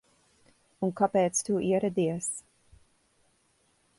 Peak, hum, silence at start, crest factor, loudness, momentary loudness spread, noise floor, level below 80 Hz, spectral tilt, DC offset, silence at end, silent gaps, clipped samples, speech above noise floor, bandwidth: -12 dBFS; none; 0.8 s; 20 dB; -28 LUFS; 8 LU; -69 dBFS; -66 dBFS; -5 dB/octave; under 0.1%; 1.6 s; none; under 0.1%; 42 dB; 11.5 kHz